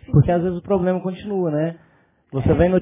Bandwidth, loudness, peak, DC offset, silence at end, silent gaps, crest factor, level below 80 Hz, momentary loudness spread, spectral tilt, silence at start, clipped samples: 3.8 kHz; -21 LUFS; -4 dBFS; under 0.1%; 0 s; none; 16 dB; -36 dBFS; 9 LU; -13 dB/octave; 0.1 s; under 0.1%